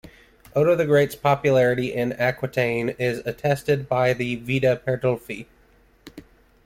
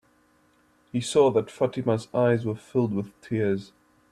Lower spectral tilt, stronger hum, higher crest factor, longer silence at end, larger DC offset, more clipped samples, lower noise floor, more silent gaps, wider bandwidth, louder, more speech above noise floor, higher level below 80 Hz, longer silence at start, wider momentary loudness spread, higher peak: about the same, -6.5 dB/octave vs -6.5 dB/octave; neither; about the same, 16 dB vs 18 dB; about the same, 0.45 s vs 0.45 s; neither; neither; second, -57 dBFS vs -63 dBFS; neither; first, 16.5 kHz vs 12.5 kHz; first, -22 LUFS vs -26 LUFS; about the same, 35 dB vs 38 dB; first, -54 dBFS vs -64 dBFS; second, 0.55 s vs 0.95 s; second, 7 LU vs 10 LU; about the same, -6 dBFS vs -8 dBFS